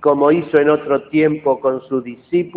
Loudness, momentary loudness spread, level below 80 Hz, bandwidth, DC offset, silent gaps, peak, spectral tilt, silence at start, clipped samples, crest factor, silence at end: -16 LUFS; 8 LU; -58 dBFS; 4.5 kHz; under 0.1%; none; -2 dBFS; -10.5 dB/octave; 0 s; under 0.1%; 14 dB; 0 s